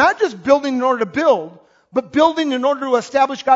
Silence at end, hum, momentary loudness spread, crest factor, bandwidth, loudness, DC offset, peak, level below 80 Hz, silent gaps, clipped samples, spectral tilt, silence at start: 0 s; none; 5 LU; 16 dB; 7.8 kHz; -17 LUFS; under 0.1%; 0 dBFS; -58 dBFS; none; under 0.1%; -4 dB/octave; 0 s